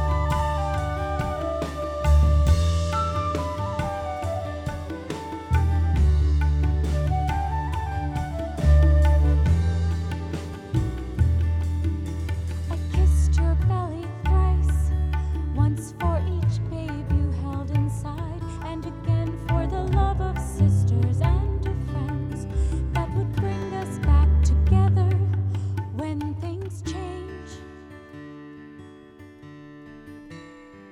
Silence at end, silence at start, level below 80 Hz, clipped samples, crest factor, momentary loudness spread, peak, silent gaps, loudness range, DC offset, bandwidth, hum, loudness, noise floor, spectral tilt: 0 s; 0 s; -26 dBFS; under 0.1%; 14 dB; 14 LU; -8 dBFS; none; 7 LU; under 0.1%; 11 kHz; none; -24 LUFS; -46 dBFS; -7.5 dB/octave